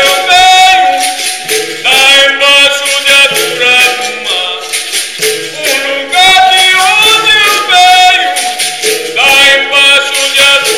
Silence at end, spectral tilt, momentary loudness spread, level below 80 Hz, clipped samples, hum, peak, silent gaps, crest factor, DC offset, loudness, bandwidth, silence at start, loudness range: 0 s; 1 dB/octave; 9 LU; -44 dBFS; under 0.1%; none; 0 dBFS; none; 8 dB; 0.8%; -5 LUFS; over 20 kHz; 0 s; 3 LU